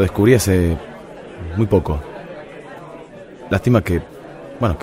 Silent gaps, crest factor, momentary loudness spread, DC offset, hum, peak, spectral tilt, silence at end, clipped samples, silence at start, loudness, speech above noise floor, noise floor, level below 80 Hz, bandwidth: none; 18 dB; 22 LU; under 0.1%; none; 0 dBFS; -6.5 dB/octave; 0 s; under 0.1%; 0 s; -18 LUFS; 21 dB; -37 dBFS; -34 dBFS; 16 kHz